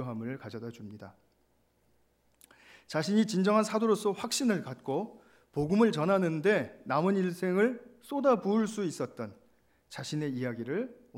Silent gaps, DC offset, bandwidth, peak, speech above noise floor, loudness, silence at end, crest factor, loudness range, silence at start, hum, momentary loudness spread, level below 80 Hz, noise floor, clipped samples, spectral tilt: none; under 0.1%; 16 kHz; -14 dBFS; 41 dB; -30 LUFS; 0 s; 18 dB; 4 LU; 0 s; none; 16 LU; -70 dBFS; -71 dBFS; under 0.1%; -5.5 dB/octave